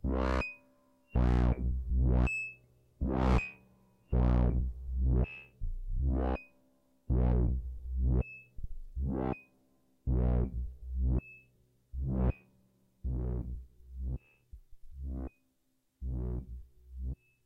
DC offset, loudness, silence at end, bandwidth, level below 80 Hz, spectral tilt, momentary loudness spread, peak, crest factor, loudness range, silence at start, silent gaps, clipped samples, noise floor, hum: under 0.1%; -34 LUFS; 0.3 s; 8.2 kHz; -36 dBFS; -9 dB/octave; 16 LU; -16 dBFS; 16 dB; 10 LU; 0.05 s; none; under 0.1%; -77 dBFS; none